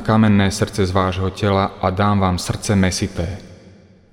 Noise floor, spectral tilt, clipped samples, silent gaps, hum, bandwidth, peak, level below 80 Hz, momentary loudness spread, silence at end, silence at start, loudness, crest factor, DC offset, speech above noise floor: -46 dBFS; -6 dB/octave; under 0.1%; none; none; 15.5 kHz; -2 dBFS; -40 dBFS; 9 LU; 0.55 s; 0 s; -18 LUFS; 16 dB; under 0.1%; 29 dB